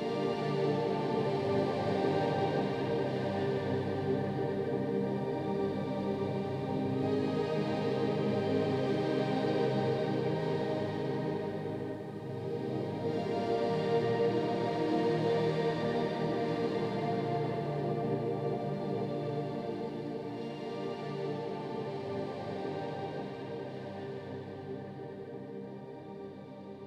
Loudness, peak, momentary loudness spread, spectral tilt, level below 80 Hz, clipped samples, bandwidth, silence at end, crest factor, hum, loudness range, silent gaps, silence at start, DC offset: -34 LUFS; -18 dBFS; 11 LU; -8 dB/octave; -66 dBFS; under 0.1%; 11 kHz; 0 s; 16 dB; none; 8 LU; none; 0 s; under 0.1%